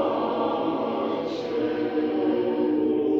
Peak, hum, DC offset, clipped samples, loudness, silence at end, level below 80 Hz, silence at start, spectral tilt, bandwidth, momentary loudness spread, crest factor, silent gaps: -12 dBFS; none; under 0.1%; under 0.1%; -25 LUFS; 0 s; -62 dBFS; 0 s; -7.5 dB/octave; 6.6 kHz; 4 LU; 12 dB; none